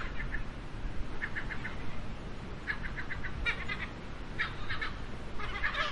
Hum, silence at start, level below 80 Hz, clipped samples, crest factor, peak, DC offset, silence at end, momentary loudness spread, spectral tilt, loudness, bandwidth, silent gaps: none; 0 s; -42 dBFS; under 0.1%; 18 dB; -18 dBFS; under 0.1%; 0 s; 10 LU; -5 dB/octave; -38 LUFS; 10.5 kHz; none